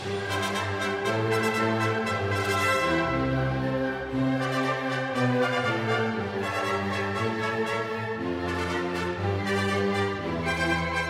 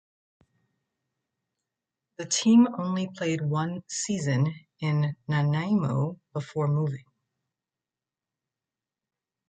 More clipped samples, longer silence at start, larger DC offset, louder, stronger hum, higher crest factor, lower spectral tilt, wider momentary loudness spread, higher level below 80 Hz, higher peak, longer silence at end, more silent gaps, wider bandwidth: neither; second, 0 s vs 2.2 s; neither; about the same, -27 LUFS vs -27 LUFS; neither; about the same, 16 dB vs 18 dB; about the same, -5.5 dB/octave vs -5.5 dB/octave; second, 5 LU vs 12 LU; first, -50 dBFS vs -70 dBFS; about the same, -10 dBFS vs -10 dBFS; second, 0 s vs 2.5 s; neither; first, 16 kHz vs 9.4 kHz